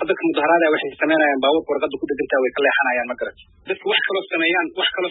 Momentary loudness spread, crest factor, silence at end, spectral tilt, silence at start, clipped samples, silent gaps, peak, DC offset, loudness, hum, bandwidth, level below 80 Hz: 9 LU; 16 dB; 0 s; -8.5 dB/octave; 0 s; under 0.1%; none; -4 dBFS; under 0.1%; -19 LUFS; none; 4.1 kHz; -60 dBFS